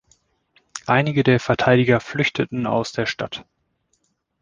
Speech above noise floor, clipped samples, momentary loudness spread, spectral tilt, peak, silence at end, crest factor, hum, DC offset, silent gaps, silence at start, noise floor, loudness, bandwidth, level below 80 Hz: 50 dB; under 0.1%; 14 LU; -6 dB/octave; -2 dBFS; 1 s; 20 dB; none; under 0.1%; none; 0.75 s; -69 dBFS; -20 LUFS; 9.6 kHz; -52 dBFS